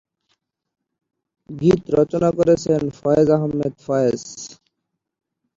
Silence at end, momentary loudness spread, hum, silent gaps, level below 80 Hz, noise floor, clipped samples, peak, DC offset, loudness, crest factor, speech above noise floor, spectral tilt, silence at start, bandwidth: 1.05 s; 16 LU; none; none; -50 dBFS; -79 dBFS; under 0.1%; -2 dBFS; under 0.1%; -19 LUFS; 18 dB; 60 dB; -7 dB/octave; 1.5 s; 7.8 kHz